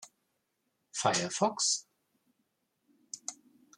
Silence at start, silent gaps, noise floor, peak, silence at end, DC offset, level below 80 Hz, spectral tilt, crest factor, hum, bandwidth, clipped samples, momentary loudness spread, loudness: 0 s; none; -81 dBFS; -12 dBFS; 0.45 s; under 0.1%; -80 dBFS; -2 dB/octave; 26 dB; none; 15 kHz; under 0.1%; 14 LU; -32 LUFS